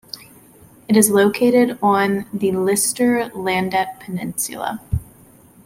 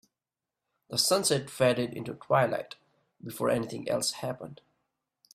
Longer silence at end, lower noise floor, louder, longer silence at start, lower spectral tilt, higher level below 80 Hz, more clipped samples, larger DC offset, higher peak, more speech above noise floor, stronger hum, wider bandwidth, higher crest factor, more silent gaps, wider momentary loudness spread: second, 0.65 s vs 0.8 s; second, -48 dBFS vs -90 dBFS; first, -18 LUFS vs -28 LUFS; second, 0.15 s vs 0.9 s; about the same, -4.5 dB/octave vs -3.5 dB/octave; first, -42 dBFS vs -68 dBFS; neither; neither; first, -2 dBFS vs -10 dBFS; second, 30 dB vs 61 dB; neither; about the same, 16.5 kHz vs 16 kHz; about the same, 18 dB vs 20 dB; neither; second, 13 LU vs 17 LU